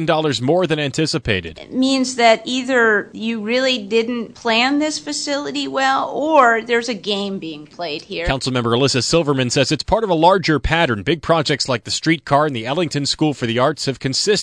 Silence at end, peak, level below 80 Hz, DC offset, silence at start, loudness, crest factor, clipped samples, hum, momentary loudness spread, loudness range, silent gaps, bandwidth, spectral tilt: 0 s; 0 dBFS; -40 dBFS; under 0.1%; 0 s; -17 LUFS; 18 dB; under 0.1%; none; 8 LU; 2 LU; none; 10.5 kHz; -4 dB/octave